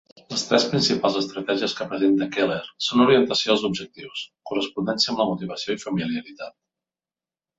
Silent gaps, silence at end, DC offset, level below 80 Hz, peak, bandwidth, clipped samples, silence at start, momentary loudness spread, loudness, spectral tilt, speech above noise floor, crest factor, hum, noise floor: none; 1.1 s; under 0.1%; -62 dBFS; -4 dBFS; 8 kHz; under 0.1%; 0.3 s; 14 LU; -22 LUFS; -4.5 dB/octave; over 67 dB; 20 dB; none; under -90 dBFS